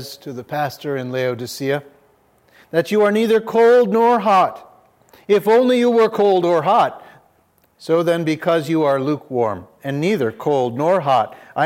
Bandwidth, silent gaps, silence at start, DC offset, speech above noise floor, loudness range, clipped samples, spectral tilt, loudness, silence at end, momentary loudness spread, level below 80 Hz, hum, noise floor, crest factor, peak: 16.5 kHz; none; 0 s; under 0.1%; 42 dB; 5 LU; under 0.1%; -6 dB/octave; -17 LUFS; 0 s; 11 LU; -70 dBFS; none; -59 dBFS; 14 dB; -4 dBFS